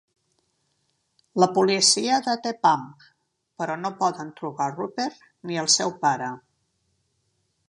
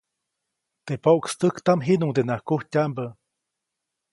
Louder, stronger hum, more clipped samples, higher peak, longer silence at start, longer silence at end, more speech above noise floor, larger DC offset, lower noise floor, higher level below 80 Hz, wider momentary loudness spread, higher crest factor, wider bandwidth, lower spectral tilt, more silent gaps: about the same, -23 LUFS vs -23 LUFS; neither; neither; about the same, -4 dBFS vs -6 dBFS; first, 1.35 s vs 0.85 s; first, 1.3 s vs 1 s; second, 48 dB vs 61 dB; neither; second, -72 dBFS vs -83 dBFS; second, -74 dBFS vs -66 dBFS; first, 16 LU vs 10 LU; about the same, 22 dB vs 20 dB; about the same, 11.5 kHz vs 11.5 kHz; second, -2.5 dB/octave vs -6.5 dB/octave; neither